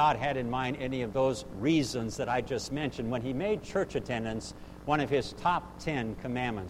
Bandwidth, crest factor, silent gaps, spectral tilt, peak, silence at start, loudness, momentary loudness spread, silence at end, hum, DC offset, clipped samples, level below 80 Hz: 15.5 kHz; 18 dB; none; -5.5 dB/octave; -14 dBFS; 0 s; -32 LUFS; 6 LU; 0 s; none; under 0.1%; under 0.1%; -50 dBFS